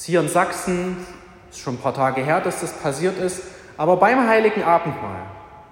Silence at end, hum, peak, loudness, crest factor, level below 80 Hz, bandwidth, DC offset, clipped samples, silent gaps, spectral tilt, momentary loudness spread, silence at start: 0.1 s; none; -2 dBFS; -20 LUFS; 20 dB; -54 dBFS; 16.5 kHz; under 0.1%; under 0.1%; none; -5 dB/octave; 17 LU; 0 s